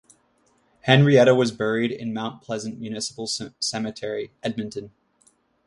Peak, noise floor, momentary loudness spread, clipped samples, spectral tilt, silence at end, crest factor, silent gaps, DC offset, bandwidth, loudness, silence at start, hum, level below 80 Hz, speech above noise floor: 0 dBFS; -64 dBFS; 16 LU; under 0.1%; -5 dB/octave; 0.8 s; 24 dB; none; under 0.1%; 11.5 kHz; -23 LUFS; 0.85 s; none; -64 dBFS; 42 dB